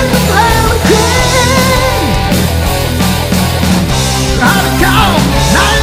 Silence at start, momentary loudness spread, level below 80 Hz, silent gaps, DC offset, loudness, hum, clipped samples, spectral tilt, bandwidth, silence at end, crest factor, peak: 0 s; 4 LU; -18 dBFS; none; under 0.1%; -9 LUFS; none; 0.3%; -4 dB/octave; 16.5 kHz; 0 s; 10 dB; 0 dBFS